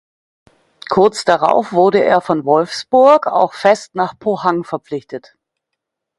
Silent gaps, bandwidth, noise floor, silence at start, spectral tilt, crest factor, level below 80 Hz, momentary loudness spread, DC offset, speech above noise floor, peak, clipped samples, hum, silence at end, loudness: none; 11.5 kHz; -78 dBFS; 0.9 s; -5 dB/octave; 16 dB; -58 dBFS; 14 LU; under 0.1%; 64 dB; 0 dBFS; under 0.1%; none; 1 s; -14 LUFS